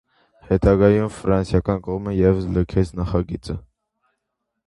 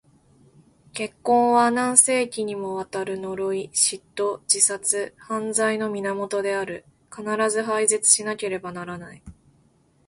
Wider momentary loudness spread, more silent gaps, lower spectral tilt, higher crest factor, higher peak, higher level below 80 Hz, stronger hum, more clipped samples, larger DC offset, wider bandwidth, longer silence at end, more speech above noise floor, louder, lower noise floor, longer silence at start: second, 12 LU vs 16 LU; neither; first, -8.5 dB/octave vs -2 dB/octave; about the same, 20 dB vs 24 dB; about the same, -2 dBFS vs 0 dBFS; first, -34 dBFS vs -62 dBFS; neither; neither; neither; about the same, 11.5 kHz vs 11.5 kHz; first, 1.1 s vs 0.75 s; first, 59 dB vs 38 dB; about the same, -20 LUFS vs -22 LUFS; first, -78 dBFS vs -61 dBFS; second, 0.5 s vs 0.95 s